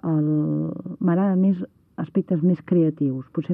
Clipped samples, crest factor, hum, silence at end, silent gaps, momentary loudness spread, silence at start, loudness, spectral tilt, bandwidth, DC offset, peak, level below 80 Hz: under 0.1%; 12 dB; none; 0 s; none; 9 LU; 0.05 s; -22 LUFS; -12.5 dB/octave; 3.4 kHz; under 0.1%; -10 dBFS; -66 dBFS